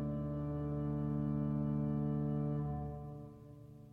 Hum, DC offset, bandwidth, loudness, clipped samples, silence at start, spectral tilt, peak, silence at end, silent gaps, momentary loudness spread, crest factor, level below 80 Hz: none; under 0.1%; 3.1 kHz; -38 LUFS; under 0.1%; 0 s; -11.5 dB/octave; -28 dBFS; 0 s; none; 16 LU; 10 dB; -52 dBFS